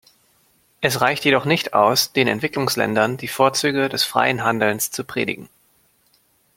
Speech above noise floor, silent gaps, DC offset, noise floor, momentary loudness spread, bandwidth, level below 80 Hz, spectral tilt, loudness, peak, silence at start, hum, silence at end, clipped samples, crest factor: 41 dB; none; under 0.1%; -61 dBFS; 7 LU; 16.5 kHz; -60 dBFS; -3.5 dB/octave; -19 LUFS; 0 dBFS; 0.8 s; none; 1.1 s; under 0.1%; 20 dB